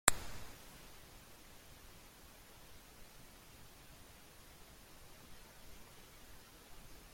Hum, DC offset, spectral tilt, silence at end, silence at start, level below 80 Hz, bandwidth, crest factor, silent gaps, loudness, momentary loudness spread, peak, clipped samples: none; under 0.1%; -1 dB/octave; 0 s; 0.05 s; -60 dBFS; 16.5 kHz; 44 dB; none; -50 LUFS; 5 LU; -2 dBFS; under 0.1%